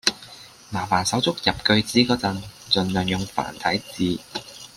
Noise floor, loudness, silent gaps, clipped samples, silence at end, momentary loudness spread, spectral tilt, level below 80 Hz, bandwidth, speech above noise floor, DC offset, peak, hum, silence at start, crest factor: -44 dBFS; -22 LUFS; none; under 0.1%; 0.1 s; 15 LU; -4 dB/octave; -52 dBFS; 16 kHz; 22 dB; under 0.1%; -2 dBFS; none; 0.05 s; 22 dB